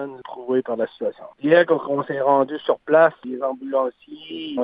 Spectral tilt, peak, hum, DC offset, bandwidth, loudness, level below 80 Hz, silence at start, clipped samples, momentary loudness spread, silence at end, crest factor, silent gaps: -9 dB/octave; -2 dBFS; none; under 0.1%; 5 kHz; -21 LUFS; -70 dBFS; 0 s; under 0.1%; 15 LU; 0 s; 18 dB; none